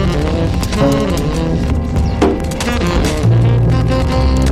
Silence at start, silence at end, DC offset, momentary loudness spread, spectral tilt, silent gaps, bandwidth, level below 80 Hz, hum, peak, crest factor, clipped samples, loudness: 0 s; 0 s; under 0.1%; 4 LU; -6.5 dB/octave; none; 14.5 kHz; -20 dBFS; none; -2 dBFS; 10 dB; under 0.1%; -14 LUFS